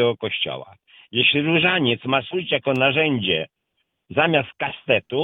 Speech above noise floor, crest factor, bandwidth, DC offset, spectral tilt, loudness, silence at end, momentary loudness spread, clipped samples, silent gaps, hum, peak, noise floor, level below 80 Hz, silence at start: 53 dB; 18 dB; 5.8 kHz; under 0.1%; -7.5 dB/octave; -20 LUFS; 0 s; 10 LU; under 0.1%; none; none; -4 dBFS; -74 dBFS; -60 dBFS; 0 s